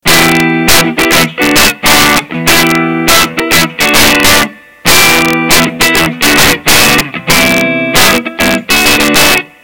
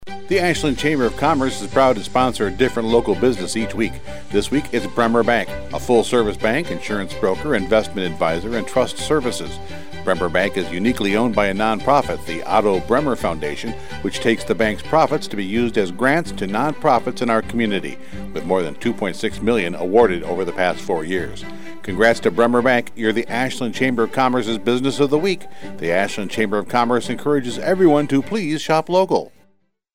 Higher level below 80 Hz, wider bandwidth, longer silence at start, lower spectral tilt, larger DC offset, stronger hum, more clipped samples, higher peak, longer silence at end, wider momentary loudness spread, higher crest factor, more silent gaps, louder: first, -30 dBFS vs -42 dBFS; first, over 20 kHz vs 16.5 kHz; about the same, 0 s vs 0 s; second, -2 dB/octave vs -5 dB/octave; about the same, 6% vs 3%; neither; first, 3% vs under 0.1%; about the same, 0 dBFS vs -2 dBFS; about the same, 0 s vs 0 s; second, 4 LU vs 9 LU; second, 8 dB vs 16 dB; neither; first, -6 LUFS vs -19 LUFS